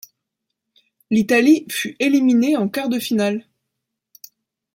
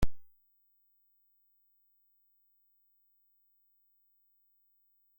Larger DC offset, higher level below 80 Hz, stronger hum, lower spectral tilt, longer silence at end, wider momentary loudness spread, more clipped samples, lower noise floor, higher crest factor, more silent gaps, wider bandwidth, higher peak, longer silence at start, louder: neither; second, -66 dBFS vs -48 dBFS; second, none vs 50 Hz at -115 dBFS; second, -5 dB/octave vs -6.5 dB/octave; second, 1.35 s vs 4.95 s; first, 8 LU vs 0 LU; neither; first, -79 dBFS vs -72 dBFS; second, 16 dB vs 24 dB; neither; about the same, 16.5 kHz vs 16.5 kHz; first, -4 dBFS vs -16 dBFS; first, 1.1 s vs 0 s; first, -18 LUFS vs -42 LUFS